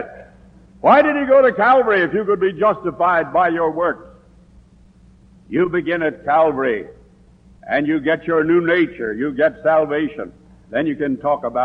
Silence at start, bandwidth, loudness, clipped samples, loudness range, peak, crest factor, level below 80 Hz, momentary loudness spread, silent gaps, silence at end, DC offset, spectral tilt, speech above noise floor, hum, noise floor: 0 s; 5.6 kHz; -17 LUFS; under 0.1%; 6 LU; -2 dBFS; 16 dB; -52 dBFS; 10 LU; none; 0 s; under 0.1%; -8 dB/octave; 32 dB; none; -48 dBFS